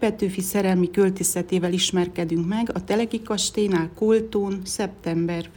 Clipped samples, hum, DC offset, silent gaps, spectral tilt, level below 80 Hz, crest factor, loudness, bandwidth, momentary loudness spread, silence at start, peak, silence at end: under 0.1%; none; under 0.1%; none; -4.5 dB/octave; -52 dBFS; 16 dB; -23 LUFS; 18 kHz; 5 LU; 0 s; -8 dBFS; 0.05 s